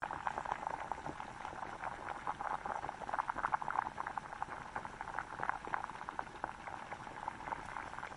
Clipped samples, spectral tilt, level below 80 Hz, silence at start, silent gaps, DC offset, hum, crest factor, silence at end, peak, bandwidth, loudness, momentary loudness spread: under 0.1%; -4.5 dB/octave; -64 dBFS; 0 s; none; under 0.1%; none; 26 dB; 0 s; -16 dBFS; 11 kHz; -42 LUFS; 8 LU